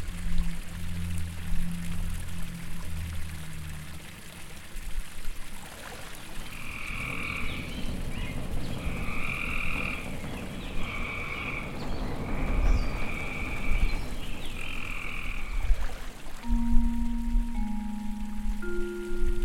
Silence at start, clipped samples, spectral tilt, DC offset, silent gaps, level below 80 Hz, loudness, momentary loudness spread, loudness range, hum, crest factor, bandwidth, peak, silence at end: 0 s; under 0.1%; -5 dB/octave; under 0.1%; none; -32 dBFS; -35 LUFS; 11 LU; 7 LU; none; 20 dB; 14 kHz; -8 dBFS; 0 s